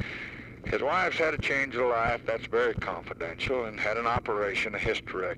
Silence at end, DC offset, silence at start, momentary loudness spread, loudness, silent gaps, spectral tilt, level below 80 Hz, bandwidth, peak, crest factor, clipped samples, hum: 0 s; under 0.1%; 0 s; 9 LU; -29 LUFS; none; -5 dB/octave; -48 dBFS; 11.5 kHz; -14 dBFS; 16 dB; under 0.1%; none